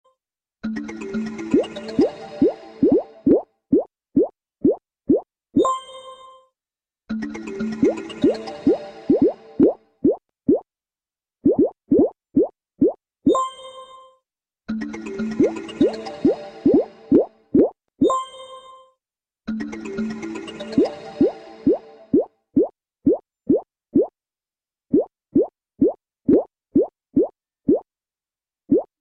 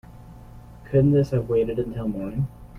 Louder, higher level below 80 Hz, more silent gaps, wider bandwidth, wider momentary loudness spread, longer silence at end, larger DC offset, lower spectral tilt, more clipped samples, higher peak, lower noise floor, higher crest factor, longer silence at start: about the same, -22 LUFS vs -23 LUFS; second, -54 dBFS vs -44 dBFS; neither; first, 9 kHz vs 6.4 kHz; about the same, 11 LU vs 10 LU; first, 0.2 s vs 0 s; neither; second, -7.5 dB/octave vs -10 dB/octave; neither; about the same, -4 dBFS vs -6 dBFS; first, under -90 dBFS vs -43 dBFS; about the same, 18 dB vs 18 dB; first, 0.65 s vs 0.1 s